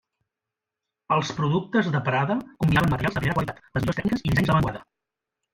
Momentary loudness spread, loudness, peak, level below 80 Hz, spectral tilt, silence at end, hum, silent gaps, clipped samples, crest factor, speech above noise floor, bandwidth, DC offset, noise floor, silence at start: 7 LU; -24 LUFS; -8 dBFS; -46 dBFS; -7 dB/octave; 0.7 s; none; none; under 0.1%; 18 dB; 64 dB; 16 kHz; under 0.1%; -87 dBFS; 1.1 s